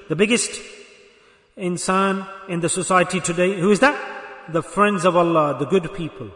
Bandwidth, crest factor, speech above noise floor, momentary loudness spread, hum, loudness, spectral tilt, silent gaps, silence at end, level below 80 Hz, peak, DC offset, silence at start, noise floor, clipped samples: 11 kHz; 18 dB; 34 dB; 13 LU; none; -20 LUFS; -4.5 dB/octave; none; 0 s; -54 dBFS; -4 dBFS; under 0.1%; 0 s; -53 dBFS; under 0.1%